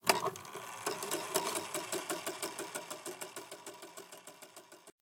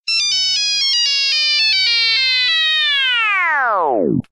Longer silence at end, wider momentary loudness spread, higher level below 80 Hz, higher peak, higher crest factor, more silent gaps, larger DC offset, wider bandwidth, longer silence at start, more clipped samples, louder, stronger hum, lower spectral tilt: about the same, 0.1 s vs 0.1 s; first, 17 LU vs 4 LU; second, -88 dBFS vs -58 dBFS; second, -10 dBFS vs -4 dBFS; first, 30 dB vs 12 dB; neither; neither; first, 17 kHz vs 13.5 kHz; about the same, 0.05 s vs 0.05 s; neither; second, -39 LUFS vs -13 LUFS; neither; about the same, -1.5 dB/octave vs -1 dB/octave